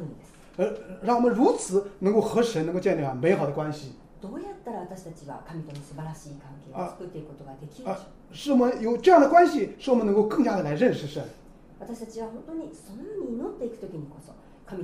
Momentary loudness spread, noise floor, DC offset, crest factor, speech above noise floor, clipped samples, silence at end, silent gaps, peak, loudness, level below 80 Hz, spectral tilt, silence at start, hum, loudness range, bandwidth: 20 LU; -46 dBFS; under 0.1%; 20 dB; 20 dB; under 0.1%; 0 s; none; -6 dBFS; -24 LUFS; -54 dBFS; -6.5 dB/octave; 0 s; none; 17 LU; 15.5 kHz